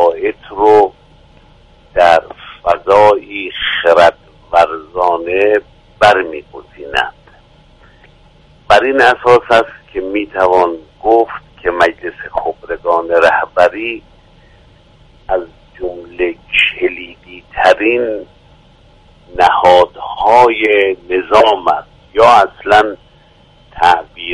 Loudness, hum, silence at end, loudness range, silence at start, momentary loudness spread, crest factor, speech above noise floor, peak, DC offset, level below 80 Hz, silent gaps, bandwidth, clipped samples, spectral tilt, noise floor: -12 LUFS; none; 0 s; 5 LU; 0 s; 14 LU; 12 dB; 35 dB; 0 dBFS; under 0.1%; -42 dBFS; none; 11.5 kHz; 0.3%; -4.5 dB/octave; -45 dBFS